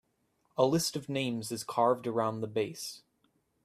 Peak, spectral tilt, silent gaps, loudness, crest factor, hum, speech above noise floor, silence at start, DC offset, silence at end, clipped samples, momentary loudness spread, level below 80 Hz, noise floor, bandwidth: -12 dBFS; -4.5 dB/octave; none; -32 LUFS; 20 dB; none; 44 dB; 0.55 s; under 0.1%; 0.65 s; under 0.1%; 13 LU; -72 dBFS; -75 dBFS; 15.5 kHz